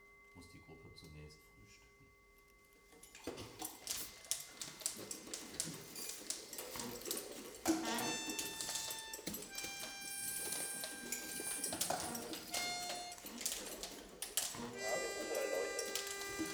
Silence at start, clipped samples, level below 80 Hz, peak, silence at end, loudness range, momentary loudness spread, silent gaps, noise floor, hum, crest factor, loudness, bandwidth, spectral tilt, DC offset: 0 s; under 0.1%; -70 dBFS; -14 dBFS; 0 s; 8 LU; 18 LU; none; -66 dBFS; none; 30 dB; -42 LUFS; over 20 kHz; -1.5 dB/octave; under 0.1%